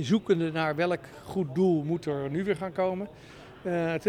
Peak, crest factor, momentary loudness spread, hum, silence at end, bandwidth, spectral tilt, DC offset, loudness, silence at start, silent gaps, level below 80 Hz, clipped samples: -12 dBFS; 16 dB; 12 LU; none; 0 s; 14.5 kHz; -7 dB/octave; under 0.1%; -29 LUFS; 0 s; none; -62 dBFS; under 0.1%